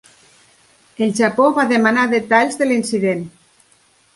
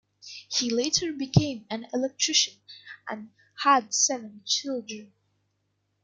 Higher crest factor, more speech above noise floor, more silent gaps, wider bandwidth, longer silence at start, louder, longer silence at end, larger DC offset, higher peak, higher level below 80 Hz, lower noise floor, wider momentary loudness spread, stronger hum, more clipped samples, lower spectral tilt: second, 18 dB vs 24 dB; second, 40 dB vs 49 dB; neither; about the same, 11.5 kHz vs 11 kHz; first, 1 s vs 0.25 s; first, -16 LUFS vs -25 LUFS; second, 0.85 s vs 1 s; neither; first, 0 dBFS vs -6 dBFS; about the same, -62 dBFS vs -58 dBFS; second, -55 dBFS vs -75 dBFS; second, 7 LU vs 20 LU; second, none vs 50 Hz at -60 dBFS; neither; first, -5 dB/octave vs -3 dB/octave